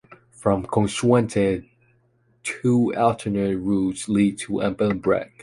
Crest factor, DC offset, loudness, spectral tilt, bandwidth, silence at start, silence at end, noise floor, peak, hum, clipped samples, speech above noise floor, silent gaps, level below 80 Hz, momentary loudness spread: 18 dB; under 0.1%; -22 LUFS; -6.5 dB/octave; 11.5 kHz; 0.4 s; 0.15 s; -63 dBFS; -4 dBFS; none; under 0.1%; 41 dB; none; -50 dBFS; 6 LU